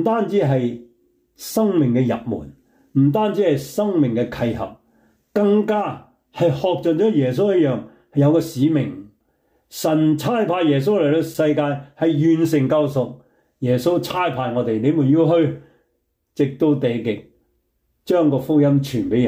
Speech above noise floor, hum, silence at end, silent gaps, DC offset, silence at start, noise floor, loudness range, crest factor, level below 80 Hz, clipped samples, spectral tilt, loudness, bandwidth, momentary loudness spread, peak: 52 dB; none; 0 s; none; under 0.1%; 0 s; -70 dBFS; 2 LU; 12 dB; -56 dBFS; under 0.1%; -7.5 dB/octave; -19 LUFS; 16 kHz; 11 LU; -6 dBFS